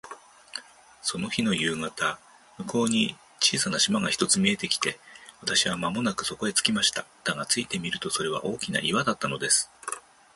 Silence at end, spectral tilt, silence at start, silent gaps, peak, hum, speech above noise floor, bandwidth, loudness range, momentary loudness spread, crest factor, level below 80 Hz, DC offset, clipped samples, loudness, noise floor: 0.35 s; -2.5 dB/octave; 0.05 s; none; -4 dBFS; none; 20 dB; 12 kHz; 2 LU; 14 LU; 24 dB; -62 dBFS; under 0.1%; under 0.1%; -26 LUFS; -47 dBFS